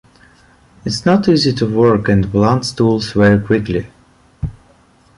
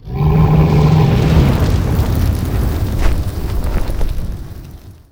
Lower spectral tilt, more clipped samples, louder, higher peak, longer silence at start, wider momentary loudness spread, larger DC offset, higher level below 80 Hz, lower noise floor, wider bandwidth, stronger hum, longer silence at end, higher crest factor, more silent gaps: about the same, -6.5 dB/octave vs -7.5 dB/octave; neither; about the same, -14 LUFS vs -15 LUFS; about the same, -2 dBFS vs 0 dBFS; first, 0.85 s vs 0.05 s; first, 16 LU vs 13 LU; neither; second, -38 dBFS vs -18 dBFS; first, -50 dBFS vs -34 dBFS; second, 11.5 kHz vs 17 kHz; neither; first, 0.65 s vs 0.2 s; about the same, 14 dB vs 14 dB; neither